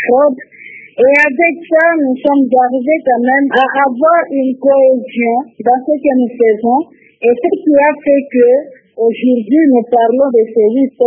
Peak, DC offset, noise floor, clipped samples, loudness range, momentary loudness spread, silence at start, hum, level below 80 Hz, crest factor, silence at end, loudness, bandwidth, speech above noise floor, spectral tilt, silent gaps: 0 dBFS; under 0.1%; -35 dBFS; under 0.1%; 2 LU; 6 LU; 0 s; none; -60 dBFS; 10 dB; 0 s; -11 LUFS; 7.2 kHz; 24 dB; -7 dB/octave; none